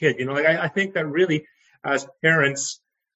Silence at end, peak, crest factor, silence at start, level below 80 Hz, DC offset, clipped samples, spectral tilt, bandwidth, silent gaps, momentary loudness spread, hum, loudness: 0.4 s; -6 dBFS; 18 dB; 0 s; -68 dBFS; under 0.1%; under 0.1%; -4 dB/octave; 8.6 kHz; none; 10 LU; none; -22 LUFS